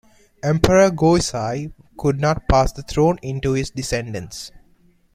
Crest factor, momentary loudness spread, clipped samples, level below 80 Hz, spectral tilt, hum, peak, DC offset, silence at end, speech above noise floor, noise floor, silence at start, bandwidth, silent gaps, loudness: 20 dB; 15 LU; under 0.1%; -34 dBFS; -5.5 dB/octave; none; 0 dBFS; under 0.1%; 0.55 s; 37 dB; -56 dBFS; 0.45 s; 15 kHz; none; -19 LUFS